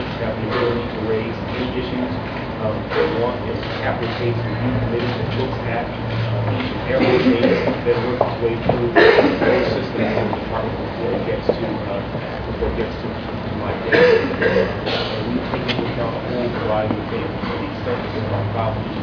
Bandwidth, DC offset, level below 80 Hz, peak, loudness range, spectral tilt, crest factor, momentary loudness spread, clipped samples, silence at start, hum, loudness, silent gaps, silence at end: 5.4 kHz; under 0.1%; -38 dBFS; 0 dBFS; 6 LU; -8 dB/octave; 20 dB; 9 LU; under 0.1%; 0 s; none; -20 LUFS; none; 0 s